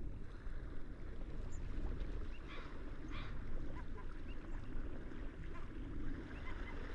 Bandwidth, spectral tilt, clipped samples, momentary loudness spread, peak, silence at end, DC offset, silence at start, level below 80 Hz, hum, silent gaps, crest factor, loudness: 7.6 kHz; -7 dB/octave; under 0.1%; 4 LU; -30 dBFS; 0 s; under 0.1%; 0 s; -46 dBFS; none; none; 14 dB; -50 LUFS